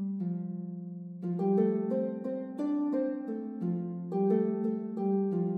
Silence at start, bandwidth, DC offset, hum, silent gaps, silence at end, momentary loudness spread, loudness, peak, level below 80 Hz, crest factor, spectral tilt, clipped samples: 0 s; 3.8 kHz; under 0.1%; none; none; 0 s; 10 LU; -32 LUFS; -16 dBFS; -90 dBFS; 14 dB; -11.5 dB/octave; under 0.1%